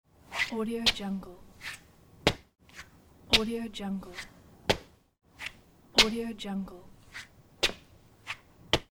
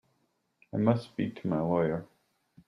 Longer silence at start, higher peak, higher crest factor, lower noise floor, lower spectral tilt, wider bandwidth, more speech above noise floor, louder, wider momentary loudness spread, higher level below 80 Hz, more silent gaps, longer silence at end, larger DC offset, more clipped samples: second, 0.3 s vs 0.75 s; first, -6 dBFS vs -10 dBFS; first, 28 dB vs 22 dB; second, -57 dBFS vs -75 dBFS; second, -3 dB/octave vs -9.5 dB/octave; first, over 20 kHz vs 10.5 kHz; second, 26 dB vs 46 dB; about the same, -30 LUFS vs -31 LUFS; first, 23 LU vs 9 LU; first, -50 dBFS vs -66 dBFS; neither; second, 0.1 s vs 0.65 s; neither; neither